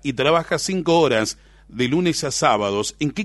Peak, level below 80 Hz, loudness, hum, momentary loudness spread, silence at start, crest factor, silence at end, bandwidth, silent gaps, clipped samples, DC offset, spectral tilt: -2 dBFS; -50 dBFS; -20 LUFS; none; 8 LU; 0.05 s; 18 dB; 0 s; 12 kHz; none; under 0.1%; under 0.1%; -4 dB/octave